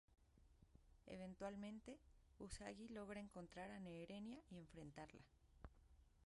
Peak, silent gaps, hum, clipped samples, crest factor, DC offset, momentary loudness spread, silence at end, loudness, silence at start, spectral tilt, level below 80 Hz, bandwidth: -38 dBFS; none; none; under 0.1%; 20 dB; under 0.1%; 13 LU; 0 s; -57 LUFS; 0.1 s; -5.5 dB/octave; -72 dBFS; 11.5 kHz